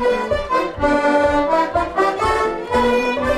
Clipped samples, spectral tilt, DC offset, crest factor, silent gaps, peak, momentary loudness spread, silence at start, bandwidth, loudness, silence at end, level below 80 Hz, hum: under 0.1%; -5 dB/octave; under 0.1%; 14 dB; none; -4 dBFS; 4 LU; 0 s; 13.5 kHz; -18 LUFS; 0 s; -36 dBFS; none